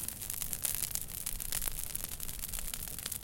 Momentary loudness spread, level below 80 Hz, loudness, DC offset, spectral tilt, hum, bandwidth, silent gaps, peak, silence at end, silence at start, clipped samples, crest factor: 5 LU; -46 dBFS; -36 LUFS; under 0.1%; -1 dB/octave; none; 17 kHz; none; -8 dBFS; 0 s; 0 s; under 0.1%; 30 dB